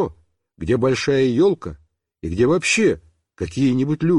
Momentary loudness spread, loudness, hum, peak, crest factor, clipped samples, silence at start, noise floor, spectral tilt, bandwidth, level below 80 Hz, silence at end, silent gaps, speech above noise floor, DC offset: 15 LU; -19 LUFS; none; -8 dBFS; 12 dB; under 0.1%; 0 s; -44 dBFS; -5.5 dB/octave; 11.5 kHz; -44 dBFS; 0 s; none; 26 dB; under 0.1%